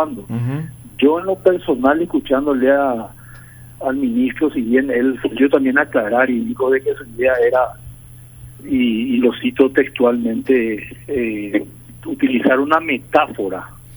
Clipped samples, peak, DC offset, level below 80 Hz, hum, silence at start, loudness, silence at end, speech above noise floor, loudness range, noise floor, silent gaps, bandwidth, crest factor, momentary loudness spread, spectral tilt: under 0.1%; 0 dBFS; under 0.1%; -48 dBFS; none; 0 s; -17 LUFS; 0 s; 22 dB; 2 LU; -39 dBFS; none; over 20 kHz; 16 dB; 10 LU; -6.5 dB/octave